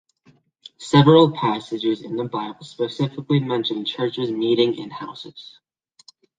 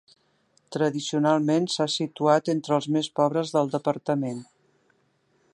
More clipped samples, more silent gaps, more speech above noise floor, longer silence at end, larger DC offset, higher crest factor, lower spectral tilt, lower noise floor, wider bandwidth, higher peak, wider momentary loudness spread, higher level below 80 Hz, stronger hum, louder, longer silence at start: neither; neither; second, 38 dB vs 43 dB; second, 0.9 s vs 1.1 s; neither; about the same, 20 dB vs 20 dB; first, -7 dB/octave vs -5.5 dB/octave; second, -58 dBFS vs -68 dBFS; second, 9.2 kHz vs 11 kHz; first, -2 dBFS vs -6 dBFS; first, 20 LU vs 5 LU; first, -62 dBFS vs -76 dBFS; neither; first, -20 LUFS vs -25 LUFS; about the same, 0.8 s vs 0.7 s